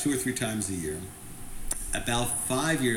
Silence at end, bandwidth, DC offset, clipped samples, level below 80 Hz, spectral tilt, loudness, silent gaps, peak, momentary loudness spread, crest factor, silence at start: 0 s; 19.5 kHz; under 0.1%; under 0.1%; -42 dBFS; -3.5 dB/octave; -29 LUFS; none; -12 dBFS; 16 LU; 18 dB; 0 s